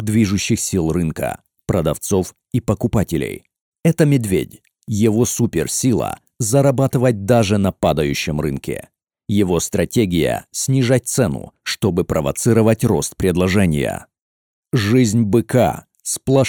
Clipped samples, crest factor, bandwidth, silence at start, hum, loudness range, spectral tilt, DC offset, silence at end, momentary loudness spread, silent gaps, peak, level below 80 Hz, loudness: under 0.1%; 16 dB; 19.5 kHz; 0 s; none; 3 LU; -5.5 dB/octave; under 0.1%; 0 s; 10 LU; 3.61-3.72 s, 14.22-14.63 s; -2 dBFS; -40 dBFS; -18 LUFS